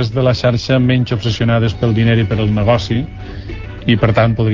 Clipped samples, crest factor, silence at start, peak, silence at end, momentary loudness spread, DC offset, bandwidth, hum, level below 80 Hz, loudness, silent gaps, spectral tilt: under 0.1%; 14 dB; 0 s; 0 dBFS; 0 s; 13 LU; 0.2%; 7.4 kHz; none; -30 dBFS; -14 LUFS; none; -7.5 dB/octave